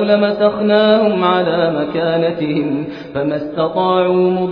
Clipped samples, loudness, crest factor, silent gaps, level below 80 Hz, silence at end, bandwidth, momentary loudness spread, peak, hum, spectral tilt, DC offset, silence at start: under 0.1%; -15 LUFS; 14 dB; none; -52 dBFS; 0 s; 5.4 kHz; 8 LU; 0 dBFS; none; -9 dB/octave; under 0.1%; 0 s